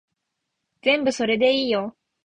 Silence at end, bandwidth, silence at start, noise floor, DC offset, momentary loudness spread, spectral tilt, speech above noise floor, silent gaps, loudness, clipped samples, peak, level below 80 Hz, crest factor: 0.35 s; 9.2 kHz; 0.85 s; -79 dBFS; under 0.1%; 7 LU; -3.5 dB/octave; 59 dB; none; -21 LUFS; under 0.1%; -8 dBFS; -64 dBFS; 16 dB